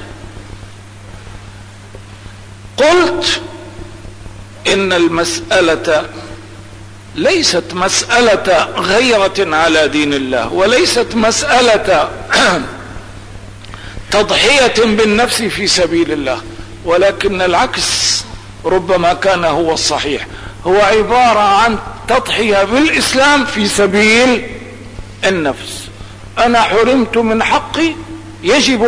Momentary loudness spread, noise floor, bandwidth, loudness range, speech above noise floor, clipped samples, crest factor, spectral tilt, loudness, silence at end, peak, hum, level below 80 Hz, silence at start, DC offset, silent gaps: 21 LU; -33 dBFS; 11 kHz; 4 LU; 21 dB; under 0.1%; 12 dB; -3 dB/octave; -12 LUFS; 0 s; -2 dBFS; none; -36 dBFS; 0 s; 0.4%; none